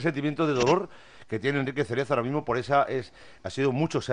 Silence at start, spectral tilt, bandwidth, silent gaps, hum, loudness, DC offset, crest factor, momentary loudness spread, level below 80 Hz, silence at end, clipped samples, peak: 0 s; -6 dB/octave; 10 kHz; none; none; -27 LUFS; under 0.1%; 18 dB; 12 LU; -60 dBFS; 0 s; under 0.1%; -8 dBFS